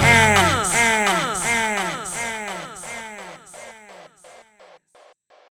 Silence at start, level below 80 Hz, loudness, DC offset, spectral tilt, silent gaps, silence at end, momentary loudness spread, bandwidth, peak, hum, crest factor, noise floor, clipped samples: 0 s; -46 dBFS; -18 LUFS; under 0.1%; -3 dB/octave; none; 1.55 s; 24 LU; over 20 kHz; -2 dBFS; none; 20 dB; -54 dBFS; under 0.1%